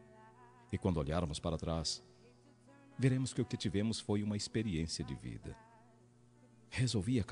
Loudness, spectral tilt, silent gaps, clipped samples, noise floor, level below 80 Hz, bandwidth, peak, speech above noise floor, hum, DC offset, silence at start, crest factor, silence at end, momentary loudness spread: -37 LUFS; -5.5 dB/octave; none; under 0.1%; -65 dBFS; -54 dBFS; 10.5 kHz; -20 dBFS; 28 dB; 60 Hz at -65 dBFS; under 0.1%; 0 s; 18 dB; 0 s; 11 LU